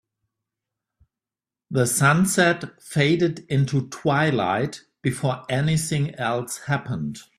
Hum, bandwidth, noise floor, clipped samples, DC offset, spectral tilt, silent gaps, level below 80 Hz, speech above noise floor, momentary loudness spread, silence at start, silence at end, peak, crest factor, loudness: none; 15 kHz; under -90 dBFS; under 0.1%; under 0.1%; -5 dB/octave; none; -58 dBFS; over 68 dB; 10 LU; 1.7 s; 0.15 s; -4 dBFS; 20 dB; -22 LUFS